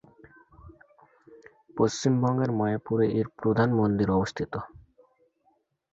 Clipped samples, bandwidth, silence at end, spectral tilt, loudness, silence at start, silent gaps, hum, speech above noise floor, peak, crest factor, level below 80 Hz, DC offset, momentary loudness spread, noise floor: under 0.1%; 8 kHz; 1.25 s; -7 dB/octave; -26 LUFS; 0.65 s; none; none; 45 dB; -10 dBFS; 18 dB; -54 dBFS; under 0.1%; 11 LU; -70 dBFS